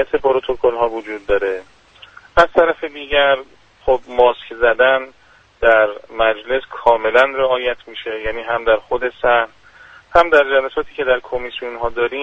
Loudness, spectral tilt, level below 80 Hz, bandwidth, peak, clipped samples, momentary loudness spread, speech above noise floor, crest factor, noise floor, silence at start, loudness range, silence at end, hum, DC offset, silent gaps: -17 LUFS; -5 dB/octave; -40 dBFS; 8 kHz; 0 dBFS; under 0.1%; 11 LU; 28 dB; 16 dB; -44 dBFS; 0 s; 2 LU; 0 s; none; under 0.1%; none